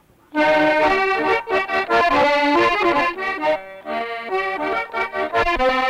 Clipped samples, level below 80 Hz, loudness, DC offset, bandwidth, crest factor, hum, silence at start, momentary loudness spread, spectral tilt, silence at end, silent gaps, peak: under 0.1%; -42 dBFS; -19 LUFS; under 0.1%; 16 kHz; 12 dB; none; 0.35 s; 9 LU; -4.5 dB/octave; 0 s; none; -8 dBFS